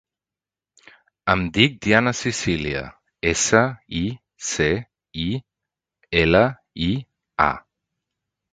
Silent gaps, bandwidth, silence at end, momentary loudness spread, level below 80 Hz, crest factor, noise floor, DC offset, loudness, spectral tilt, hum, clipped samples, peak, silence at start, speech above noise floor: none; 9.6 kHz; 0.95 s; 12 LU; -42 dBFS; 22 dB; under -90 dBFS; under 0.1%; -21 LUFS; -4 dB/octave; none; under 0.1%; 0 dBFS; 1.25 s; over 70 dB